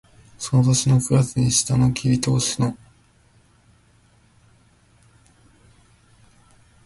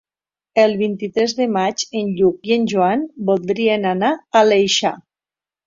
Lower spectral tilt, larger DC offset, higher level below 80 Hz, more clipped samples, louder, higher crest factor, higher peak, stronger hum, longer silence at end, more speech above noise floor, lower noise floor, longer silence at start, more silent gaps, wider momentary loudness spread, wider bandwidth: about the same, -5 dB/octave vs -4.5 dB/octave; neither; first, -48 dBFS vs -60 dBFS; neither; second, -20 LUFS vs -17 LUFS; about the same, 18 dB vs 16 dB; second, -6 dBFS vs -2 dBFS; neither; first, 4.1 s vs 0.65 s; second, 38 dB vs over 73 dB; second, -57 dBFS vs under -90 dBFS; second, 0.4 s vs 0.55 s; neither; about the same, 8 LU vs 7 LU; first, 11.5 kHz vs 7.8 kHz